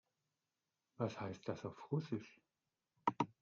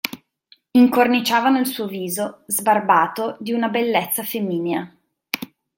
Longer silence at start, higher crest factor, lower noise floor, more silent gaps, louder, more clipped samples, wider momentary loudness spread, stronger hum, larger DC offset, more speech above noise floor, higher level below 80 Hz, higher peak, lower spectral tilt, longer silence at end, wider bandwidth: first, 1 s vs 0.05 s; first, 26 dB vs 20 dB; first, under -90 dBFS vs -57 dBFS; neither; second, -44 LUFS vs -20 LUFS; neither; second, 7 LU vs 13 LU; neither; neither; first, over 46 dB vs 38 dB; second, -84 dBFS vs -66 dBFS; second, -20 dBFS vs 0 dBFS; first, -6.5 dB/octave vs -4 dB/octave; second, 0.1 s vs 0.3 s; second, 7.4 kHz vs 17 kHz